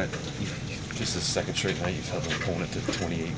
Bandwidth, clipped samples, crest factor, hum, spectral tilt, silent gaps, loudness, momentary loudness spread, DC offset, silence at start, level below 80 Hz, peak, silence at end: 8 kHz; under 0.1%; 16 dB; none; -4 dB/octave; none; -30 LUFS; 6 LU; under 0.1%; 0 s; -46 dBFS; -14 dBFS; 0 s